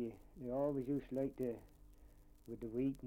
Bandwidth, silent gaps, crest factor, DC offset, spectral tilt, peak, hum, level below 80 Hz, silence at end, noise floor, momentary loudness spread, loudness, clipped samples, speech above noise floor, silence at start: 16.5 kHz; none; 16 dB; under 0.1%; -9.5 dB/octave; -26 dBFS; none; -62 dBFS; 0 s; -62 dBFS; 14 LU; -42 LUFS; under 0.1%; 21 dB; 0 s